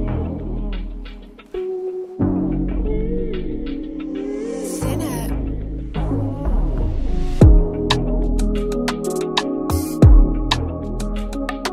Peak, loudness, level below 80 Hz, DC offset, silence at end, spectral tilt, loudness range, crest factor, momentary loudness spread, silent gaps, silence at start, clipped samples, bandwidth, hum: 0 dBFS; -21 LUFS; -22 dBFS; under 0.1%; 0 s; -6.5 dB/octave; 6 LU; 18 dB; 14 LU; none; 0 s; under 0.1%; 15 kHz; none